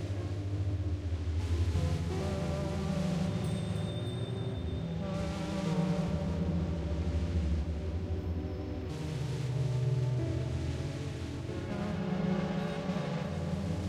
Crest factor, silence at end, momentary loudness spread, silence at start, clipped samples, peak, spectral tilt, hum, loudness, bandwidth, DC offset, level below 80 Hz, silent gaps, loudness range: 14 dB; 0 s; 5 LU; 0 s; under 0.1%; -20 dBFS; -7.5 dB/octave; none; -34 LUFS; 12 kHz; under 0.1%; -42 dBFS; none; 1 LU